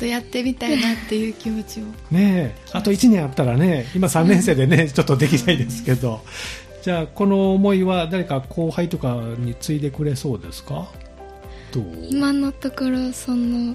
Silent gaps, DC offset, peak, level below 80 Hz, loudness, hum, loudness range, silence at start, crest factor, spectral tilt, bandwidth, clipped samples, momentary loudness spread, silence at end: none; under 0.1%; -2 dBFS; -42 dBFS; -20 LUFS; none; 8 LU; 0 s; 18 dB; -6 dB/octave; 15 kHz; under 0.1%; 15 LU; 0 s